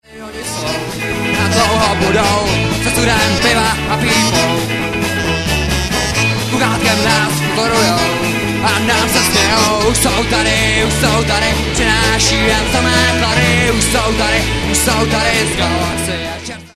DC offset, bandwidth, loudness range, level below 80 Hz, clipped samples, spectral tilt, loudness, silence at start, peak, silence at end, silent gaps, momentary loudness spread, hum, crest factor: under 0.1%; 14 kHz; 2 LU; -26 dBFS; under 0.1%; -3.5 dB/octave; -13 LUFS; 0.1 s; 0 dBFS; 0.1 s; none; 6 LU; none; 14 dB